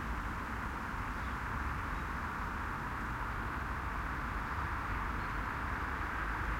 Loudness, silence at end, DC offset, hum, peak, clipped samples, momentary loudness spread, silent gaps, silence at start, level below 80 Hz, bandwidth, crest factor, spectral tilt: -38 LUFS; 0 s; under 0.1%; none; -24 dBFS; under 0.1%; 2 LU; none; 0 s; -44 dBFS; 16.5 kHz; 14 dB; -6 dB/octave